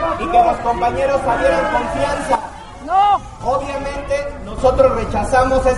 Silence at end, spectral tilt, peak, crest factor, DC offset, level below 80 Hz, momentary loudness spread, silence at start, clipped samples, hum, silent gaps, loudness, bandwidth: 0 s; -5.5 dB/octave; 0 dBFS; 16 dB; under 0.1%; -30 dBFS; 8 LU; 0 s; under 0.1%; none; none; -17 LUFS; 11.5 kHz